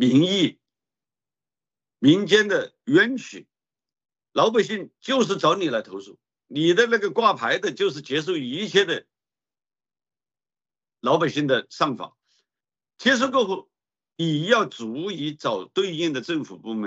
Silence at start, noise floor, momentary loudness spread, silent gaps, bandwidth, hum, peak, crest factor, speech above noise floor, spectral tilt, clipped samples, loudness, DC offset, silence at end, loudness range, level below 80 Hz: 0 s; under -90 dBFS; 11 LU; none; 8.2 kHz; none; -2 dBFS; 20 dB; over 68 dB; -5 dB/octave; under 0.1%; -22 LUFS; under 0.1%; 0 s; 5 LU; -72 dBFS